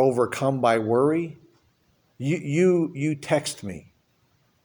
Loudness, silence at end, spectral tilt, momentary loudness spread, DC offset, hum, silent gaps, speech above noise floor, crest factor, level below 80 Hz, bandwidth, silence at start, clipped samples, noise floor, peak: -23 LUFS; 0.85 s; -6 dB/octave; 14 LU; under 0.1%; none; none; 43 dB; 16 dB; -64 dBFS; over 20 kHz; 0 s; under 0.1%; -66 dBFS; -8 dBFS